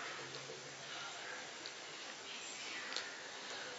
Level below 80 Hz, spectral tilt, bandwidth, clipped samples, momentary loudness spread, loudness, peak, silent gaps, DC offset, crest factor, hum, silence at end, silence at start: under -90 dBFS; 0.5 dB/octave; 7.6 kHz; under 0.1%; 5 LU; -46 LUFS; -20 dBFS; none; under 0.1%; 28 dB; none; 0 s; 0 s